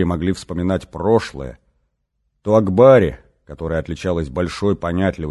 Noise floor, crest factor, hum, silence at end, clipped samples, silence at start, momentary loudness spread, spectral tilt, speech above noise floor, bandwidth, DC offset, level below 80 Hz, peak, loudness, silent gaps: -70 dBFS; 18 dB; none; 0 s; under 0.1%; 0 s; 18 LU; -7.5 dB/octave; 53 dB; 12 kHz; under 0.1%; -36 dBFS; 0 dBFS; -18 LUFS; none